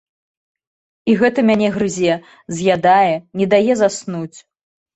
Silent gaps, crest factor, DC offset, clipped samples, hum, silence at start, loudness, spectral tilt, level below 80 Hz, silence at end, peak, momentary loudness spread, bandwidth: none; 16 dB; under 0.1%; under 0.1%; none; 1.05 s; -16 LUFS; -5.5 dB/octave; -56 dBFS; 0.55 s; -2 dBFS; 13 LU; 8.2 kHz